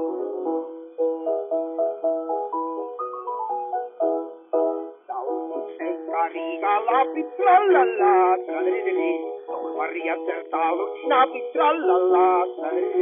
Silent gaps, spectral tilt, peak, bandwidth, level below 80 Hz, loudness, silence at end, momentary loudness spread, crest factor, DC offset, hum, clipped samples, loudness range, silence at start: none; 0.5 dB/octave; -6 dBFS; 3.7 kHz; under -90 dBFS; -23 LUFS; 0 s; 12 LU; 18 dB; under 0.1%; none; under 0.1%; 7 LU; 0 s